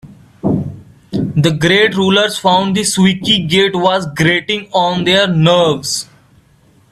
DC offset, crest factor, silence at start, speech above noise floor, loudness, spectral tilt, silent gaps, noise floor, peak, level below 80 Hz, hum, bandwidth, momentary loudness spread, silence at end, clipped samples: under 0.1%; 14 dB; 0.05 s; 37 dB; -13 LUFS; -4.5 dB/octave; none; -49 dBFS; 0 dBFS; -46 dBFS; none; 14 kHz; 9 LU; 0.85 s; under 0.1%